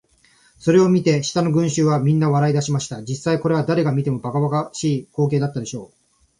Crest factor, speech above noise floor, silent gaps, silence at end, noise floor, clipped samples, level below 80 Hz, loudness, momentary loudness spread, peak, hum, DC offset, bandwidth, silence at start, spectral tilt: 16 dB; 38 dB; none; 0.55 s; -56 dBFS; under 0.1%; -56 dBFS; -19 LUFS; 9 LU; -4 dBFS; none; under 0.1%; 11 kHz; 0.6 s; -6.5 dB/octave